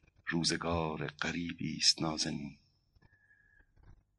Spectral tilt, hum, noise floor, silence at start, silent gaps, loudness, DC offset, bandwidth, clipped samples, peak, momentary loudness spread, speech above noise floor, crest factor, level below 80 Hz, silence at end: -3 dB/octave; none; -68 dBFS; 0.25 s; none; -33 LUFS; under 0.1%; 11.5 kHz; under 0.1%; -12 dBFS; 11 LU; 34 dB; 24 dB; -60 dBFS; 0.25 s